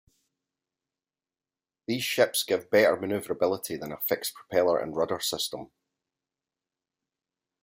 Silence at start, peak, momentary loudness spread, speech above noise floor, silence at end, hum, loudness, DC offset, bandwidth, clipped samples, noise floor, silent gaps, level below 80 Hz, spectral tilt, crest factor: 1.9 s; -8 dBFS; 10 LU; over 63 dB; 1.95 s; none; -27 LUFS; under 0.1%; 16 kHz; under 0.1%; under -90 dBFS; none; -70 dBFS; -3 dB/octave; 22 dB